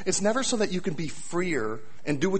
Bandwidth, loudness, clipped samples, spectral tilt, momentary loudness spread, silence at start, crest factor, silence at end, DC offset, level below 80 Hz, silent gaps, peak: 8.8 kHz; -28 LUFS; under 0.1%; -4 dB/octave; 10 LU; 0 s; 16 dB; 0 s; 2%; -56 dBFS; none; -12 dBFS